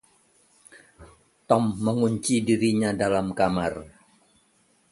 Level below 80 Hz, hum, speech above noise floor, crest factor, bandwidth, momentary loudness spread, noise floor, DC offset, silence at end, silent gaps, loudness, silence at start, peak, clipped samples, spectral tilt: -54 dBFS; none; 41 dB; 22 dB; 12 kHz; 5 LU; -64 dBFS; under 0.1%; 1.05 s; none; -24 LUFS; 1 s; -6 dBFS; under 0.1%; -5.5 dB/octave